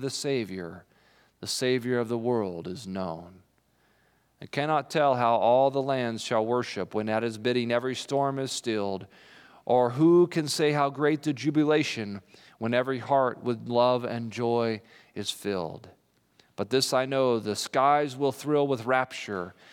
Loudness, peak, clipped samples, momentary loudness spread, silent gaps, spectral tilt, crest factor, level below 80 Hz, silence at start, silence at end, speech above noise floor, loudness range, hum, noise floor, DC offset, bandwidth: -27 LUFS; -8 dBFS; under 0.1%; 13 LU; none; -5 dB/octave; 18 dB; -78 dBFS; 0 s; 0.2 s; 40 dB; 6 LU; none; -67 dBFS; under 0.1%; 17 kHz